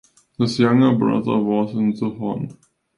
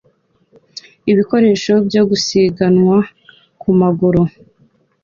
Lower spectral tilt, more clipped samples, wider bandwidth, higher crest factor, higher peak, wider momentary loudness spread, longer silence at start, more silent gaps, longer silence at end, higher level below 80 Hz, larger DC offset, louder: about the same, -7.5 dB/octave vs -6.5 dB/octave; neither; first, 11 kHz vs 7.6 kHz; first, 18 dB vs 12 dB; about the same, -2 dBFS vs -2 dBFS; about the same, 11 LU vs 12 LU; second, 0.4 s vs 0.75 s; neither; second, 0.45 s vs 0.75 s; second, -58 dBFS vs -48 dBFS; neither; second, -19 LUFS vs -14 LUFS